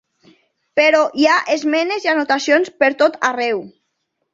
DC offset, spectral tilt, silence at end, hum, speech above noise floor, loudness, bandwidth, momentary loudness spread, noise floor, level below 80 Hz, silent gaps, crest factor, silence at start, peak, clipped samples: under 0.1%; -2.5 dB/octave; 0.65 s; none; 56 dB; -16 LUFS; 7.8 kHz; 7 LU; -72 dBFS; -66 dBFS; none; 16 dB; 0.75 s; -2 dBFS; under 0.1%